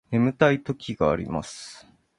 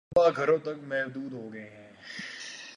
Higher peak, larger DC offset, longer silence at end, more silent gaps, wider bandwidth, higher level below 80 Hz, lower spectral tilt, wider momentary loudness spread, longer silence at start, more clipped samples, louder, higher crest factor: first, -4 dBFS vs -10 dBFS; neither; first, 0.4 s vs 0 s; neither; about the same, 11.5 kHz vs 10.5 kHz; first, -50 dBFS vs -66 dBFS; first, -6.5 dB/octave vs -5 dB/octave; about the same, 18 LU vs 20 LU; about the same, 0.1 s vs 0.1 s; neither; first, -24 LUFS vs -29 LUFS; about the same, 22 dB vs 20 dB